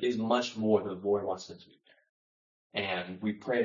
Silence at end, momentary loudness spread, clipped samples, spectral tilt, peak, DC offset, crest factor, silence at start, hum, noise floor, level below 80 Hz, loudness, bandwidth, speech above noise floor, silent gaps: 0 s; 11 LU; under 0.1%; -5.5 dB/octave; -14 dBFS; under 0.1%; 18 dB; 0 s; none; under -90 dBFS; -78 dBFS; -32 LUFS; 7.6 kHz; over 58 dB; 2.09-2.70 s